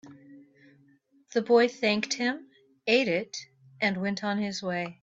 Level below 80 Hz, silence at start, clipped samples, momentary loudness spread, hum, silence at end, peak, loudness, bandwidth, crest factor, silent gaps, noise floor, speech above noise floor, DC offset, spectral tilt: -74 dBFS; 0.05 s; under 0.1%; 12 LU; none; 0.1 s; -10 dBFS; -27 LUFS; 7.8 kHz; 18 dB; none; -63 dBFS; 36 dB; under 0.1%; -4 dB/octave